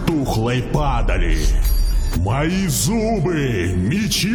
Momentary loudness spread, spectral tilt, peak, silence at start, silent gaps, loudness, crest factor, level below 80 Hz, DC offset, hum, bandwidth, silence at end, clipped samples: 3 LU; -5 dB/octave; -4 dBFS; 0 s; none; -19 LUFS; 14 dB; -20 dBFS; under 0.1%; none; 18.5 kHz; 0 s; under 0.1%